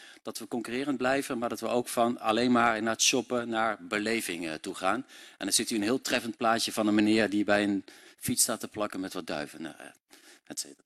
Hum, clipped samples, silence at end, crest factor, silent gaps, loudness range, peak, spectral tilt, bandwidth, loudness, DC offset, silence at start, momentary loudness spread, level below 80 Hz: none; under 0.1%; 0.1 s; 20 dB; none; 3 LU; -10 dBFS; -3 dB/octave; 14.5 kHz; -29 LUFS; under 0.1%; 0 s; 13 LU; -66 dBFS